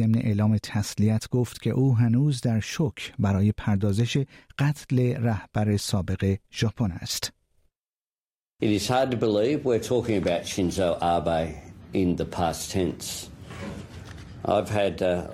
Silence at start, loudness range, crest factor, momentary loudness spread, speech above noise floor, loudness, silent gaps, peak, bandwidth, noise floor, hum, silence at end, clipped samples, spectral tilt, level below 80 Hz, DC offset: 0 s; 4 LU; 14 dB; 11 LU; over 66 dB; -26 LUFS; 7.89-8.10 s, 8.20-8.30 s, 8.36-8.40 s, 8.48-8.52 s; -10 dBFS; 15.5 kHz; under -90 dBFS; none; 0 s; under 0.1%; -6 dB/octave; -52 dBFS; under 0.1%